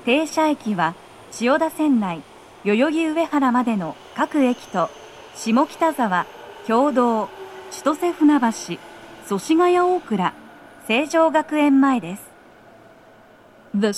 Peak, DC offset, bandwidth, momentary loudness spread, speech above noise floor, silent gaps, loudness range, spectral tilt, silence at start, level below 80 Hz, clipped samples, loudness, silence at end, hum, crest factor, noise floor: -4 dBFS; under 0.1%; 13.5 kHz; 17 LU; 29 dB; none; 2 LU; -5 dB/octave; 0 s; -64 dBFS; under 0.1%; -20 LUFS; 0 s; none; 16 dB; -49 dBFS